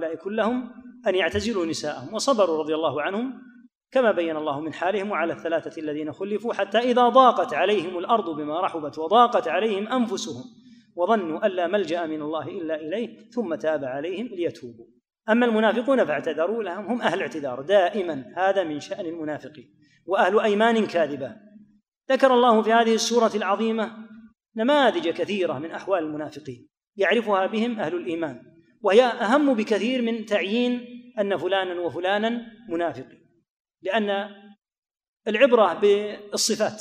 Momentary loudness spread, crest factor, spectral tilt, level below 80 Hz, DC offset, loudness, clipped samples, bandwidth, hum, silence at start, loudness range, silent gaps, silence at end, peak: 13 LU; 20 dB; -4 dB/octave; -66 dBFS; under 0.1%; -23 LUFS; under 0.1%; 15.5 kHz; none; 0 s; 6 LU; 3.77-3.81 s, 21.88-21.92 s, 26.87-26.93 s, 33.51-33.65 s, 34.78-34.82 s, 35.08-35.13 s; 0 s; -4 dBFS